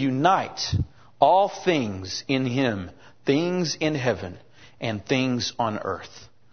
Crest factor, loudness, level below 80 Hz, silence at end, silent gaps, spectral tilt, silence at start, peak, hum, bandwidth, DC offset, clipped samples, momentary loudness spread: 22 dB; -24 LUFS; -50 dBFS; 0.25 s; none; -5 dB/octave; 0 s; -4 dBFS; none; 6.6 kHz; 0.3%; under 0.1%; 13 LU